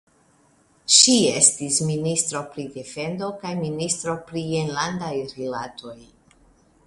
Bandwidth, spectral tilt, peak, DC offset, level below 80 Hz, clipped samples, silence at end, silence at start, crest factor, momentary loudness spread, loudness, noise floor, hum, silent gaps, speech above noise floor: 11.5 kHz; -2.5 dB/octave; 0 dBFS; under 0.1%; -60 dBFS; under 0.1%; 0.85 s; 0.9 s; 24 dB; 19 LU; -20 LUFS; -59 dBFS; none; none; 37 dB